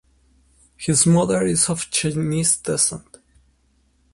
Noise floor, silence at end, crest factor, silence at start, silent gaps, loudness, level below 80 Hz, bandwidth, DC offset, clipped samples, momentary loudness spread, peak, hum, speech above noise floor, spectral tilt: -62 dBFS; 1.15 s; 20 dB; 0.8 s; none; -19 LUFS; -50 dBFS; 11.5 kHz; under 0.1%; under 0.1%; 6 LU; -2 dBFS; none; 42 dB; -4 dB/octave